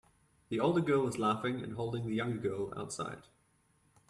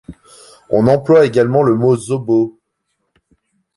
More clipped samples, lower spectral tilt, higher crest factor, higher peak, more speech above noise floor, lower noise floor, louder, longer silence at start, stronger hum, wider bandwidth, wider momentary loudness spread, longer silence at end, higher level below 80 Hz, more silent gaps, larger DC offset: neither; second, -6 dB/octave vs -7.5 dB/octave; about the same, 18 dB vs 14 dB; second, -18 dBFS vs -2 dBFS; second, 38 dB vs 58 dB; about the same, -72 dBFS vs -70 dBFS; second, -35 LUFS vs -14 LUFS; first, 0.5 s vs 0.1 s; neither; first, 13 kHz vs 11.5 kHz; first, 10 LU vs 7 LU; second, 0.9 s vs 1.25 s; second, -66 dBFS vs -50 dBFS; neither; neither